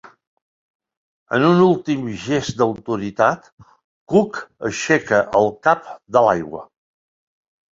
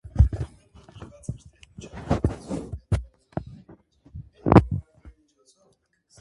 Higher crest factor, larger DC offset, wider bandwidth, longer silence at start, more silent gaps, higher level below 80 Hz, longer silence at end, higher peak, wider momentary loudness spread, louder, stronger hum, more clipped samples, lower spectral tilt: second, 18 dB vs 26 dB; neither; second, 7.8 kHz vs 11.5 kHz; first, 1.3 s vs 0.05 s; first, 3.52-3.57 s, 3.84-4.07 s vs none; second, -56 dBFS vs -32 dBFS; about the same, 1.1 s vs 1.1 s; about the same, -2 dBFS vs 0 dBFS; second, 11 LU vs 27 LU; first, -18 LUFS vs -25 LUFS; neither; neither; second, -6 dB/octave vs -8.5 dB/octave